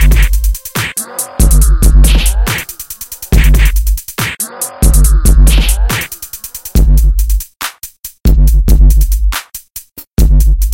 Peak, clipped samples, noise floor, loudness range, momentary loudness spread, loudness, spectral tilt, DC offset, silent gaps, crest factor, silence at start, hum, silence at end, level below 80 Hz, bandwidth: 0 dBFS; 0.3%; -31 dBFS; 2 LU; 14 LU; -12 LUFS; -4.5 dB/octave; under 0.1%; none; 8 dB; 0 s; none; 0 s; -10 dBFS; 17 kHz